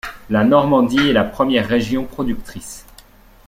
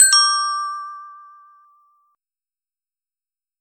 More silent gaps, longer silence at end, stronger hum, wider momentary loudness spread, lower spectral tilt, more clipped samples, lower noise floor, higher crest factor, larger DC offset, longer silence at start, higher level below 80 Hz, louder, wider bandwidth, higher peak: neither; second, 0.65 s vs 2.45 s; neither; second, 19 LU vs 26 LU; first, -5.5 dB/octave vs 8.5 dB/octave; neither; second, -46 dBFS vs under -90 dBFS; about the same, 16 dB vs 20 dB; neither; about the same, 0.05 s vs 0 s; first, -40 dBFS vs -86 dBFS; about the same, -16 LUFS vs -16 LUFS; about the same, 16 kHz vs 16 kHz; about the same, -2 dBFS vs -2 dBFS